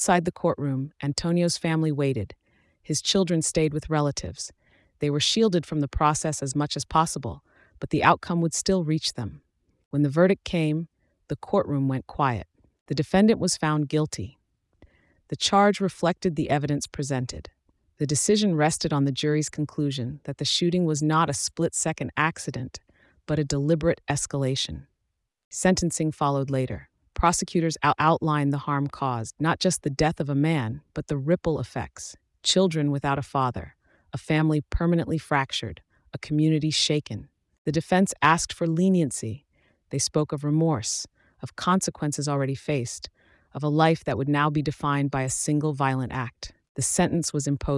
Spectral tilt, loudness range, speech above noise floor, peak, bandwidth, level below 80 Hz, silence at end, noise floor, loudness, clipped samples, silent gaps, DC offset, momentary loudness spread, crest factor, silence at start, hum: -5 dB/octave; 2 LU; 54 dB; -6 dBFS; 12 kHz; -48 dBFS; 0 s; -79 dBFS; -25 LUFS; under 0.1%; 9.85-9.91 s, 12.81-12.86 s, 25.44-25.51 s, 37.58-37.65 s, 46.69-46.75 s; under 0.1%; 14 LU; 18 dB; 0 s; none